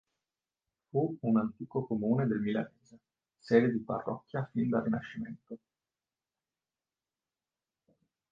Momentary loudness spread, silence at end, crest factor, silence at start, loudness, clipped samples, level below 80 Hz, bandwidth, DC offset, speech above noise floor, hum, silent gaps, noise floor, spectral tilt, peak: 16 LU; 2.75 s; 24 dB; 0.95 s; -32 LUFS; under 0.1%; -70 dBFS; 7 kHz; under 0.1%; over 58 dB; none; none; under -90 dBFS; -9.5 dB/octave; -12 dBFS